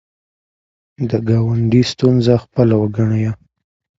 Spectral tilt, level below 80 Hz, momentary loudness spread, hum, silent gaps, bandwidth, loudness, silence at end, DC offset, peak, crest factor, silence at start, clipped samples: -8 dB/octave; -46 dBFS; 8 LU; none; none; 7.8 kHz; -16 LUFS; 0.65 s; under 0.1%; 0 dBFS; 16 dB; 1 s; under 0.1%